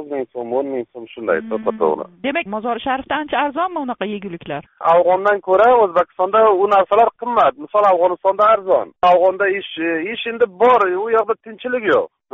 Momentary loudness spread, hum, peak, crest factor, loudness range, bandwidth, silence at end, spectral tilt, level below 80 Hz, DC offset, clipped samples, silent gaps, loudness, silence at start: 11 LU; none; -4 dBFS; 14 dB; 7 LU; 6.6 kHz; 0.25 s; -2.5 dB/octave; -58 dBFS; under 0.1%; under 0.1%; none; -17 LUFS; 0 s